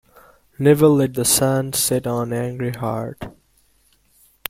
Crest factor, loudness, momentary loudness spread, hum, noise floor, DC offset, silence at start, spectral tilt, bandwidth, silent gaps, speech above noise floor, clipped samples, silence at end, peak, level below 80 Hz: 20 dB; -18 LUFS; 14 LU; none; -59 dBFS; under 0.1%; 0.6 s; -4.5 dB/octave; 16.5 kHz; none; 41 dB; under 0.1%; 1.2 s; 0 dBFS; -52 dBFS